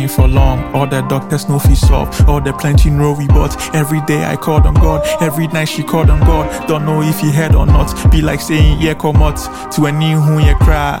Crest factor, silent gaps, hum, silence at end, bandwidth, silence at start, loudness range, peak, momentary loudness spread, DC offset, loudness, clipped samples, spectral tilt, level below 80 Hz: 10 dB; none; none; 0 s; 17 kHz; 0 s; 1 LU; 0 dBFS; 5 LU; under 0.1%; -12 LUFS; under 0.1%; -6.5 dB/octave; -14 dBFS